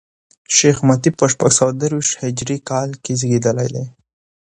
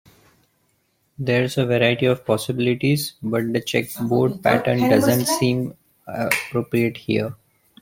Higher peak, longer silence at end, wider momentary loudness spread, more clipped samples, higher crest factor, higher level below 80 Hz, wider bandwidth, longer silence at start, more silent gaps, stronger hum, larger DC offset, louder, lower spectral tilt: about the same, 0 dBFS vs 0 dBFS; first, 0.6 s vs 0.45 s; about the same, 9 LU vs 7 LU; neither; about the same, 18 dB vs 20 dB; about the same, -54 dBFS vs -56 dBFS; second, 10.5 kHz vs 16.5 kHz; second, 0.5 s vs 1.2 s; neither; neither; neither; first, -16 LUFS vs -21 LUFS; about the same, -4.5 dB/octave vs -5.5 dB/octave